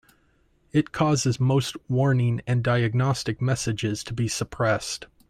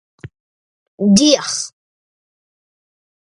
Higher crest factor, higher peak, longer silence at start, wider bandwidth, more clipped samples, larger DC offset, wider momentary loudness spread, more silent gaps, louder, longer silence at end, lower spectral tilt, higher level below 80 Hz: about the same, 16 dB vs 20 dB; second, -8 dBFS vs 0 dBFS; first, 0.75 s vs 0.25 s; first, 13.5 kHz vs 11.5 kHz; neither; neither; second, 5 LU vs 13 LU; second, none vs 0.40-0.98 s; second, -24 LUFS vs -14 LUFS; second, 0.25 s vs 1.55 s; first, -5.5 dB/octave vs -4 dB/octave; about the same, -52 dBFS vs -54 dBFS